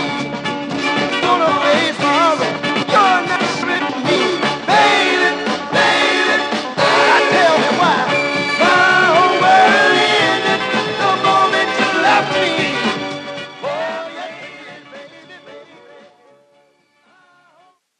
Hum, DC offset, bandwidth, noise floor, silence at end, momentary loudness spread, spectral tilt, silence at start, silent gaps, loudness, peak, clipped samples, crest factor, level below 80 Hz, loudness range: none; under 0.1%; 10.5 kHz; -56 dBFS; 2.35 s; 12 LU; -3.5 dB/octave; 0 s; none; -14 LUFS; -2 dBFS; under 0.1%; 14 dB; -60 dBFS; 12 LU